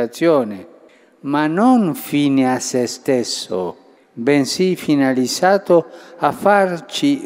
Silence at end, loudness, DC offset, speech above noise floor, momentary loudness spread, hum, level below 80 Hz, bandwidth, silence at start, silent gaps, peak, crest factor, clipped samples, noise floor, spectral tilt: 0 s; -17 LUFS; under 0.1%; 32 dB; 9 LU; none; -64 dBFS; 16 kHz; 0 s; none; 0 dBFS; 16 dB; under 0.1%; -48 dBFS; -5 dB/octave